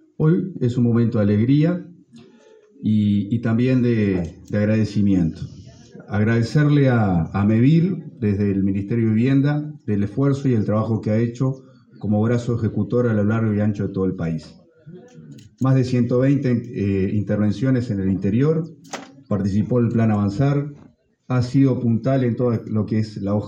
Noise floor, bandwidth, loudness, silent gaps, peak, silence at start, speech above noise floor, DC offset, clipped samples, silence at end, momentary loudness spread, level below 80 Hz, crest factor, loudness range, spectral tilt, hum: -51 dBFS; 7.8 kHz; -20 LUFS; none; -6 dBFS; 0.2 s; 32 dB; under 0.1%; under 0.1%; 0 s; 8 LU; -54 dBFS; 14 dB; 3 LU; -9 dB/octave; none